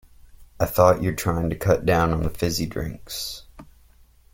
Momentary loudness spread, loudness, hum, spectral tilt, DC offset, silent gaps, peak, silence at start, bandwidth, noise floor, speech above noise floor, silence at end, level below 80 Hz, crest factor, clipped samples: 13 LU; -23 LUFS; none; -5.5 dB/octave; under 0.1%; none; -2 dBFS; 0.4 s; 17 kHz; -54 dBFS; 32 dB; 0.7 s; -40 dBFS; 22 dB; under 0.1%